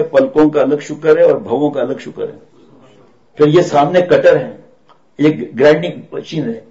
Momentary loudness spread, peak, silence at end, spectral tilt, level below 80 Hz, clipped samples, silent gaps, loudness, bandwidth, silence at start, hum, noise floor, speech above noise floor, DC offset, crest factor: 13 LU; -2 dBFS; 0.1 s; -7 dB/octave; -52 dBFS; under 0.1%; none; -13 LUFS; 7.8 kHz; 0 s; none; -50 dBFS; 38 dB; 0.3%; 12 dB